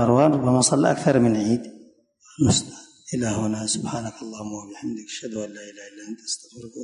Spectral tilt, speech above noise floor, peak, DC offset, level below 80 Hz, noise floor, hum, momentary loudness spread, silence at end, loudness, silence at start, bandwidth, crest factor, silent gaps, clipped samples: -5 dB/octave; 32 dB; -4 dBFS; under 0.1%; -50 dBFS; -54 dBFS; none; 21 LU; 0 s; -23 LUFS; 0 s; 11 kHz; 18 dB; none; under 0.1%